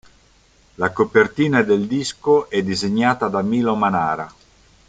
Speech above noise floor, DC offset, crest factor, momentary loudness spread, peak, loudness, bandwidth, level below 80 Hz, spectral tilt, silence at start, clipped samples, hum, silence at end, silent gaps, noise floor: 36 dB; under 0.1%; 18 dB; 7 LU; -2 dBFS; -19 LUFS; 9.2 kHz; -54 dBFS; -5.5 dB/octave; 0.8 s; under 0.1%; none; 0.6 s; none; -54 dBFS